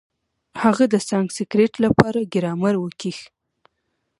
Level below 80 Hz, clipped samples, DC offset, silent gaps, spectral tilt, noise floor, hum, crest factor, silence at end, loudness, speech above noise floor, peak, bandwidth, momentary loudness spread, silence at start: -52 dBFS; under 0.1%; under 0.1%; none; -6 dB/octave; -74 dBFS; none; 22 dB; 0.95 s; -20 LUFS; 55 dB; 0 dBFS; 11.5 kHz; 13 LU; 0.55 s